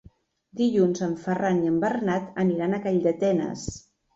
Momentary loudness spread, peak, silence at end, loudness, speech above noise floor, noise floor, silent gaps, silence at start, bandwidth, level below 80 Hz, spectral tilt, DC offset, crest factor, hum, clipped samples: 11 LU; -10 dBFS; 0.35 s; -25 LUFS; 31 dB; -56 dBFS; none; 0.55 s; 8 kHz; -56 dBFS; -7 dB/octave; under 0.1%; 14 dB; none; under 0.1%